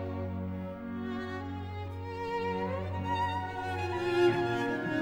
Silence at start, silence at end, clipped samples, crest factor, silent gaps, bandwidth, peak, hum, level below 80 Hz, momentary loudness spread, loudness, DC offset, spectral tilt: 0 s; 0 s; under 0.1%; 18 dB; none; 11.5 kHz; -14 dBFS; none; -58 dBFS; 12 LU; -33 LUFS; under 0.1%; -7 dB/octave